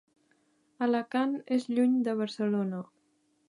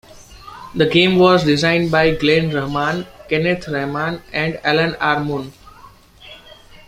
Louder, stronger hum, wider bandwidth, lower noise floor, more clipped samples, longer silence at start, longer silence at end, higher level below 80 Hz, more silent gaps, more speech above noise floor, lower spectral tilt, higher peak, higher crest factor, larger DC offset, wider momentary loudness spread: second, -30 LUFS vs -17 LUFS; neither; second, 10.5 kHz vs 15.5 kHz; first, -72 dBFS vs -44 dBFS; neither; first, 0.8 s vs 0.15 s; first, 0.65 s vs 0.35 s; second, -84 dBFS vs -44 dBFS; neither; first, 43 dB vs 28 dB; about the same, -7 dB/octave vs -6 dB/octave; second, -16 dBFS vs 0 dBFS; about the same, 14 dB vs 18 dB; neither; second, 8 LU vs 13 LU